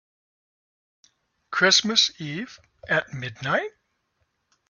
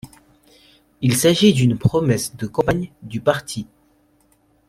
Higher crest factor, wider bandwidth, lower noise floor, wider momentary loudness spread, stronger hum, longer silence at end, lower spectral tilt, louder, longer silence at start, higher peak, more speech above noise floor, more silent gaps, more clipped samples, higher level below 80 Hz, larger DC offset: first, 24 dB vs 18 dB; second, 7.4 kHz vs 16 kHz; first, -73 dBFS vs -59 dBFS; about the same, 17 LU vs 16 LU; neither; about the same, 1 s vs 1.05 s; second, -2 dB/octave vs -5.5 dB/octave; second, -22 LUFS vs -19 LUFS; first, 1.5 s vs 0.05 s; about the same, -4 dBFS vs -2 dBFS; first, 50 dB vs 41 dB; neither; neither; second, -66 dBFS vs -48 dBFS; neither